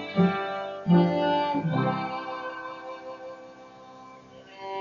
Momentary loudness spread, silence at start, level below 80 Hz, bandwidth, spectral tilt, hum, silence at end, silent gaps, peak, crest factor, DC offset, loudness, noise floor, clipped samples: 25 LU; 0 s; -68 dBFS; 6.6 kHz; -6 dB/octave; none; 0 s; none; -10 dBFS; 18 dB; under 0.1%; -27 LUFS; -48 dBFS; under 0.1%